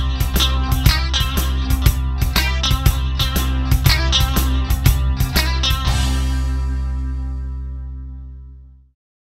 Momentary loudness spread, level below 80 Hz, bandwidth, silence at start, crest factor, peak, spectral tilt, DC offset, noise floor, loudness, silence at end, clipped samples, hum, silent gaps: 12 LU; -20 dBFS; 16.5 kHz; 0 s; 18 dB; 0 dBFS; -4 dB/octave; under 0.1%; -40 dBFS; -18 LUFS; 0.7 s; under 0.1%; none; none